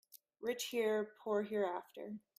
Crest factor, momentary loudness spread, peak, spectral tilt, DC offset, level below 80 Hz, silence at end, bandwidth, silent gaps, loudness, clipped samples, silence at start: 16 dB; 11 LU; -24 dBFS; -4 dB/octave; under 0.1%; -86 dBFS; 0.2 s; 16 kHz; none; -39 LUFS; under 0.1%; 0.15 s